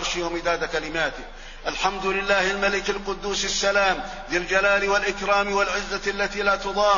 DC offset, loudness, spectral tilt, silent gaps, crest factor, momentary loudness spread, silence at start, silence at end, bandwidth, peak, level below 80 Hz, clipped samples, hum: under 0.1%; -23 LUFS; -2.5 dB/octave; none; 18 dB; 8 LU; 0 s; 0 s; 7.4 kHz; -6 dBFS; -40 dBFS; under 0.1%; none